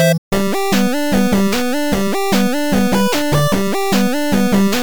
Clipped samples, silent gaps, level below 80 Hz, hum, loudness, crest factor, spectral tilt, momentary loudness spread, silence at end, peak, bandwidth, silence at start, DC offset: under 0.1%; 0.18-0.31 s; -36 dBFS; none; -16 LUFS; 12 dB; -5 dB/octave; 3 LU; 0 s; -4 dBFS; over 20 kHz; 0 s; 7%